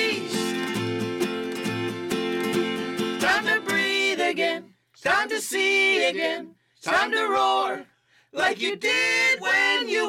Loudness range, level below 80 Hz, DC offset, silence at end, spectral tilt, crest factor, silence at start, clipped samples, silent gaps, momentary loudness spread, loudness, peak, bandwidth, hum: 3 LU; -66 dBFS; under 0.1%; 0 s; -3 dB/octave; 14 dB; 0 s; under 0.1%; none; 9 LU; -23 LUFS; -10 dBFS; 17.5 kHz; none